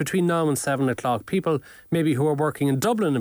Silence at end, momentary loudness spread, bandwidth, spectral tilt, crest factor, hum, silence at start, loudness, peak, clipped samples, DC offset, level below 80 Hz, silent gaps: 0 s; 4 LU; over 20 kHz; -6 dB/octave; 12 dB; none; 0 s; -23 LUFS; -12 dBFS; under 0.1%; under 0.1%; -60 dBFS; none